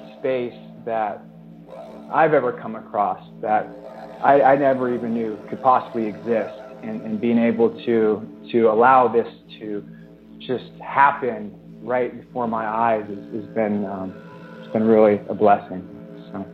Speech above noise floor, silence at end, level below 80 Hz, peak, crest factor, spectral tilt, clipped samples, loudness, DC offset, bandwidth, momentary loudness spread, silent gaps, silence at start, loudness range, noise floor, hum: 22 dB; 0 s; -64 dBFS; -2 dBFS; 20 dB; -9 dB/octave; under 0.1%; -20 LUFS; under 0.1%; 5.6 kHz; 20 LU; none; 0 s; 5 LU; -42 dBFS; none